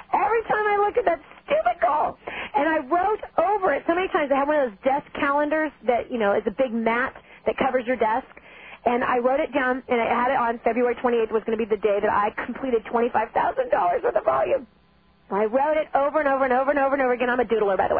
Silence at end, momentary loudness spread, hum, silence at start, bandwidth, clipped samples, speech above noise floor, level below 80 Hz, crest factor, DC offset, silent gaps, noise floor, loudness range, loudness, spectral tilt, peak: 0 s; 4 LU; none; 0.1 s; 4.7 kHz; under 0.1%; 36 dB; -54 dBFS; 16 dB; under 0.1%; none; -59 dBFS; 2 LU; -23 LUFS; -9 dB/octave; -6 dBFS